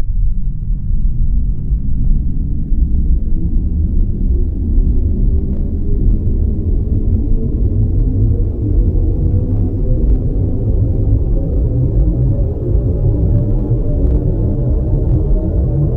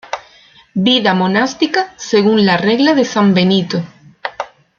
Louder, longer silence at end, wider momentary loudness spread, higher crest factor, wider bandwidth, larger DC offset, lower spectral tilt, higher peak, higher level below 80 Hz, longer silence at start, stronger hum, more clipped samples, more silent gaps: second, -17 LUFS vs -13 LUFS; second, 0 s vs 0.3 s; second, 5 LU vs 16 LU; about the same, 12 dB vs 14 dB; second, 1.4 kHz vs 7.2 kHz; neither; first, -13.5 dB/octave vs -5.5 dB/octave; about the same, -2 dBFS vs 0 dBFS; first, -14 dBFS vs -56 dBFS; about the same, 0 s vs 0.1 s; neither; neither; neither